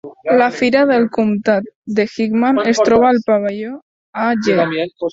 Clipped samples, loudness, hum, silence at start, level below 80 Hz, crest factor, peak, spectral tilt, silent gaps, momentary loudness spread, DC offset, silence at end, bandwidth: under 0.1%; -15 LUFS; none; 0.05 s; -54 dBFS; 14 dB; -2 dBFS; -5.5 dB/octave; 1.75-1.82 s, 3.82-4.13 s; 9 LU; under 0.1%; 0 s; 7.8 kHz